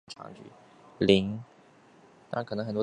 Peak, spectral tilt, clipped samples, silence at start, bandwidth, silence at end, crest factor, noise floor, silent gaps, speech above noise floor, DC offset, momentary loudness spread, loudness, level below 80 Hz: -4 dBFS; -6.5 dB/octave; under 0.1%; 0.1 s; 9.8 kHz; 0 s; 26 dB; -58 dBFS; none; 29 dB; under 0.1%; 22 LU; -28 LUFS; -60 dBFS